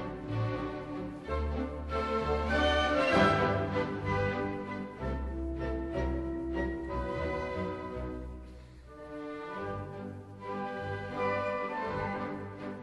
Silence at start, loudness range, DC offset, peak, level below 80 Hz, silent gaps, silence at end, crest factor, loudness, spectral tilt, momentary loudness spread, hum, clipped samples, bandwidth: 0 s; 10 LU; under 0.1%; -12 dBFS; -42 dBFS; none; 0 s; 22 dB; -33 LUFS; -6.5 dB/octave; 15 LU; none; under 0.1%; 11.5 kHz